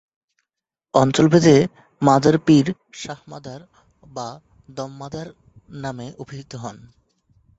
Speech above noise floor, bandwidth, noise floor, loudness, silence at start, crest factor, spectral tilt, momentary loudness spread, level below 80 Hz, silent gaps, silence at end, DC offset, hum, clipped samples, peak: 65 dB; 8 kHz; -84 dBFS; -17 LUFS; 0.95 s; 20 dB; -6.5 dB/octave; 22 LU; -56 dBFS; none; 0.85 s; under 0.1%; none; under 0.1%; -2 dBFS